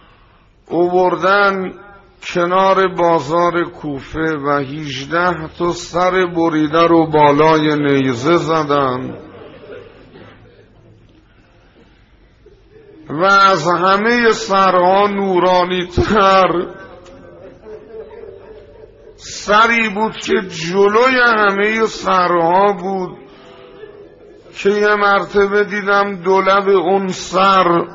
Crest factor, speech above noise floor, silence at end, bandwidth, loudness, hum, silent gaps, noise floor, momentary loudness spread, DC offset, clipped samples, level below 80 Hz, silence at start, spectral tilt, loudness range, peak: 14 dB; 35 dB; 0 s; 7.8 kHz; -14 LUFS; none; none; -49 dBFS; 14 LU; under 0.1%; under 0.1%; -44 dBFS; 0.7 s; -3.5 dB/octave; 6 LU; 0 dBFS